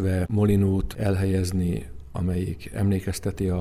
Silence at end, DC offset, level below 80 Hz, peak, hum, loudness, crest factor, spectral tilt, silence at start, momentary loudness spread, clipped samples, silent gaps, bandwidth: 0 s; under 0.1%; -40 dBFS; -10 dBFS; none; -25 LUFS; 14 dB; -7.5 dB/octave; 0 s; 9 LU; under 0.1%; none; 14 kHz